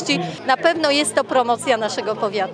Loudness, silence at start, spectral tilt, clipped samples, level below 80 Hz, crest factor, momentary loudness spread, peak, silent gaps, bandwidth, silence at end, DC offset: -19 LUFS; 0 s; -3 dB/octave; under 0.1%; -66 dBFS; 18 dB; 6 LU; -2 dBFS; none; 10.5 kHz; 0 s; under 0.1%